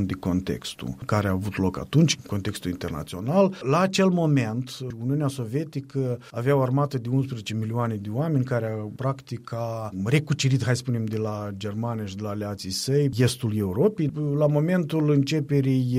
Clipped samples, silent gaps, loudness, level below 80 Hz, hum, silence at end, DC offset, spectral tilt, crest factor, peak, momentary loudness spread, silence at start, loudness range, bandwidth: under 0.1%; none; -25 LUFS; -54 dBFS; none; 0 s; under 0.1%; -6.5 dB/octave; 16 dB; -8 dBFS; 9 LU; 0 s; 3 LU; 15.5 kHz